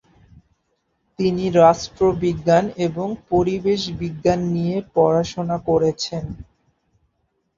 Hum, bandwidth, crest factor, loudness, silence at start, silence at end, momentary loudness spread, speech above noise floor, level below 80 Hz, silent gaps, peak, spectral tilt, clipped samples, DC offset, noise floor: none; 7.6 kHz; 20 dB; -20 LUFS; 1.2 s; 1.15 s; 11 LU; 51 dB; -46 dBFS; none; -2 dBFS; -6.5 dB/octave; under 0.1%; under 0.1%; -70 dBFS